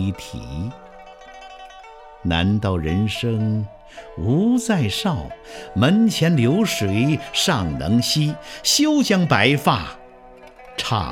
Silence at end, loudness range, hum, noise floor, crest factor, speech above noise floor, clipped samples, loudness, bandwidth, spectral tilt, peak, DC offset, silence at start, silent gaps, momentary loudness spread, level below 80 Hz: 0 s; 6 LU; none; -44 dBFS; 20 dB; 24 dB; under 0.1%; -19 LUFS; 17 kHz; -5 dB/octave; 0 dBFS; under 0.1%; 0 s; none; 18 LU; -42 dBFS